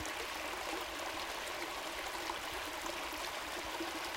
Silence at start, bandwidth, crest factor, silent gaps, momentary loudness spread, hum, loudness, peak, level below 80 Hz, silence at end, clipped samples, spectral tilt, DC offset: 0 s; 17 kHz; 18 dB; none; 1 LU; none; -40 LUFS; -24 dBFS; -62 dBFS; 0 s; under 0.1%; -1.5 dB/octave; under 0.1%